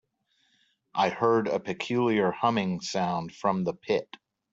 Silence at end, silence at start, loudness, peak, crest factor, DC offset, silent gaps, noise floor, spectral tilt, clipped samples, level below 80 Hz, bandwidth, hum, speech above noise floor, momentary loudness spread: 0.5 s; 0.95 s; -28 LUFS; -10 dBFS; 18 dB; under 0.1%; none; -71 dBFS; -5.5 dB/octave; under 0.1%; -68 dBFS; 7.8 kHz; none; 44 dB; 6 LU